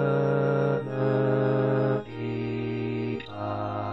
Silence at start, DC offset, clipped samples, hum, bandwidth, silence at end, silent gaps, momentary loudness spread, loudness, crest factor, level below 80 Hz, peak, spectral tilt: 0 s; 0.1%; under 0.1%; none; 6 kHz; 0 s; none; 8 LU; -27 LUFS; 14 dB; -58 dBFS; -12 dBFS; -10 dB/octave